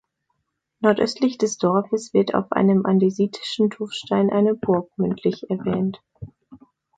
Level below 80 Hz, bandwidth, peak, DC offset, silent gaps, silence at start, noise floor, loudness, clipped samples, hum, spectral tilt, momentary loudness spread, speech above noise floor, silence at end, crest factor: -60 dBFS; 9.2 kHz; -4 dBFS; under 0.1%; none; 0.8 s; -76 dBFS; -21 LUFS; under 0.1%; none; -6.5 dB/octave; 7 LU; 55 dB; 0.4 s; 18 dB